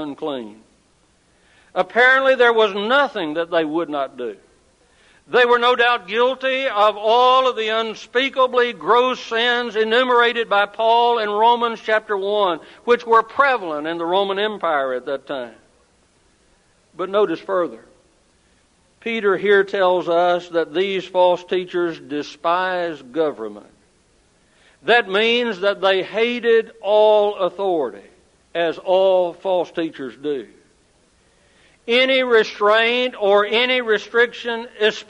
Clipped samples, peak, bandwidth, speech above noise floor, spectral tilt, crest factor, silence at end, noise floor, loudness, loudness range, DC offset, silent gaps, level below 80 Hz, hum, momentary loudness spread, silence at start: under 0.1%; -2 dBFS; 10.5 kHz; 40 dB; -4 dB/octave; 16 dB; 0.05 s; -58 dBFS; -18 LUFS; 7 LU; under 0.1%; none; -66 dBFS; none; 12 LU; 0 s